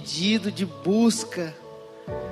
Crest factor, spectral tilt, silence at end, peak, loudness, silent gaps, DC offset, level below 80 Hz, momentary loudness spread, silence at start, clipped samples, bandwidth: 16 dB; -4.5 dB/octave; 0 s; -10 dBFS; -25 LUFS; none; under 0.1%; -58 dBFS; 20 LU; 0 s; under 0.1%; 13 kHz